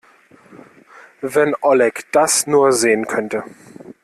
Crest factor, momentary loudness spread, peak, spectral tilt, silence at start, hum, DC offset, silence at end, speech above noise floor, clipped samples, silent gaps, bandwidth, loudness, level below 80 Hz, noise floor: 16 dB; 13 LU; -2 dBFS; -3 dB/octave; 0.5 s; none; under 0.1%; 0.15 s; 33 dB; under 0.1%; none; 14 kHz; -16 LUFS; -62 dBFS; -49 dBFS